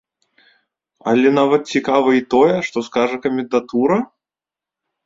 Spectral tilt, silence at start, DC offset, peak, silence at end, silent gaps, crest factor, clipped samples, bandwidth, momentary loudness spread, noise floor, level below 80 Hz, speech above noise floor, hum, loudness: -6 dB/octave; 1.05 s; under 0.1%; -2 dBFS; 1 s; none; 16 dB; under 0.1%; 7.8 kHz; 7 LU; -89 dBFS; -60 dBFS; 73 dB; none; -17 LUFS